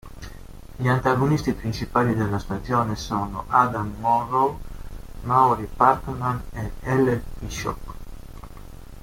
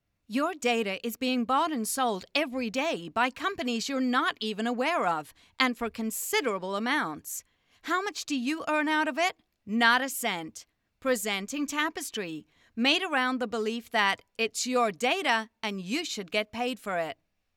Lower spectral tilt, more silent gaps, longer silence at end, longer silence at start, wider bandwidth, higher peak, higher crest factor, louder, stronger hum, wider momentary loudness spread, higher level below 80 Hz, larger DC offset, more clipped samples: first, -6.5 dB/octave vs -2.5 dB/octave; neither; second, 0 s vs 0.45 s; second, 0.05 s vs 0.3 s; about the same, 16.5 kHz vs 18 kHz; first, -2 dBFS vs -6 dBFS; about the same, 20 dB vs 22 dB; first, -23 LUFS vs -29 LUFS; neither; first, 22 LU vs 9 LU; first, -40 dBFS vs -72 dBFS; neither; neither